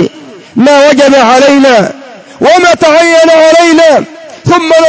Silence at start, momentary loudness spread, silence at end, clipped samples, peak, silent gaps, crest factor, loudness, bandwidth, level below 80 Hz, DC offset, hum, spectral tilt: 0 s; 11 LU; 0 s; 7%; 0 dBFS; none; 4 dB; -4 LUFS; 8 kHz; -46 dBFS; under 0.1%; none; -4 dB/octave